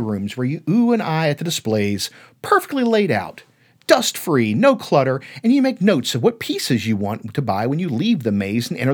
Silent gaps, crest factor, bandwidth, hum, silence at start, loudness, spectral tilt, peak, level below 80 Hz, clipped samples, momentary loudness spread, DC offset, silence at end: none; 18 dB; over 20 kHz; none; 0 s; -19 LUFS; -5.5 dB/octave; 0 dBFS; -66 dBFS; under 0.1%; 7 LU; under 0.1%; 0 s